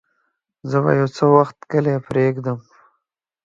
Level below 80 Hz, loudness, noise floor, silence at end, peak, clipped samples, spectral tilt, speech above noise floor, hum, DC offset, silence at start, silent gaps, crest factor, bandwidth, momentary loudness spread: -58 dBFS; -18 LUFS; -75 dBFS; 0.85 s; 0 dBFS; under 0.1%; -8.5 dB/octave; 57 dB; none; under 0.1%; 0.65 s; none; 20 dB; 7.6 kHz; 12 LU